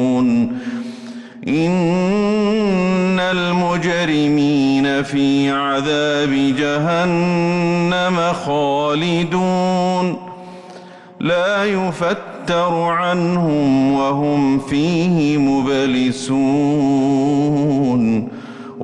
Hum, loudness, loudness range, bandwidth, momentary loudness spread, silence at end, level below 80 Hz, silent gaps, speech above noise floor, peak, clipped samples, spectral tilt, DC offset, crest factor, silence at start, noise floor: none; -17 LUFS; 3 LU; 10.5 kHz; 7 LU; 0 s; -50 dBFS; none; 22 dB; -8 dBFS; under 0.1%; -6.5 dB/octave; under 0.1%; 8 dB; 0 s; -38 dBFS